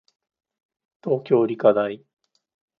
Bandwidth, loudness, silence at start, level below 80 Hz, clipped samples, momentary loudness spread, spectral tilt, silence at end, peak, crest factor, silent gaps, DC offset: 5.2 kHz; -21 LUFS; 1.05 s; -72 dBFS; under 0.1%; 16 LU; -9.5 dB/octave; 0.85 s; -4 dBFS; 20 dB; none; under 0.1%